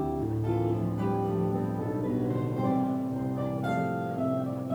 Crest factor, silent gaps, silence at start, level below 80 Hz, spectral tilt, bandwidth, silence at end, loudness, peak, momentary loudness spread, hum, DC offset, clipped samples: 14 dB; none; 0 s; -52 dBFS; -9.5 dB/octave; over 20 kHz; 0 s; -30 LUFS; -16 dBFS; 3 LU; none; under 0.1%; under 0.1%